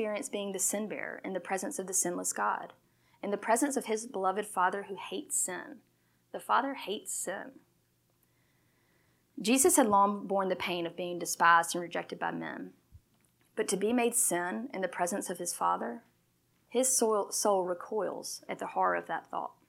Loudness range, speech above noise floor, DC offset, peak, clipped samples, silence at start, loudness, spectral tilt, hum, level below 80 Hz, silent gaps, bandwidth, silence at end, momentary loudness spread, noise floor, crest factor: 7 LU; 41 dB; under 0.1%; -10 dBFS; under 0.1%; 0 s; -31 LUFS; -2.5 dB/octave; none; -78 dBFS; none; 16.5 kHz; 0.15 s; 14 LU; -72 dBFS; 22 dB